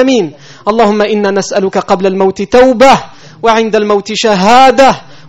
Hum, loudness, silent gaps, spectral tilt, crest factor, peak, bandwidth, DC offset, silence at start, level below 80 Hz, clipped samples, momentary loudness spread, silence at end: none; -8 LUFS; none; -4.5 dB/octave; 8 dB; 0 dBFS; 12.5 kHz; under 0.1%; 0 s; -40 dBFS; 3%; 8 LU; 0.25 s